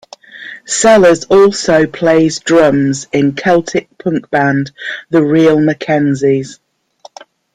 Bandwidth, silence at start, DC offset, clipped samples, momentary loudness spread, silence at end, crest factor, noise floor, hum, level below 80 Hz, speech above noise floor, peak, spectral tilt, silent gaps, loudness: 10.5 kHz; 0.35 s; under 0.1%; under 0.1%; 11 LU; 1 s; 12 dB; -42 dBFS; none; -48 dBFS; 31 dB; 0 dBFS; -5 dB/octave; none; -11 LUFS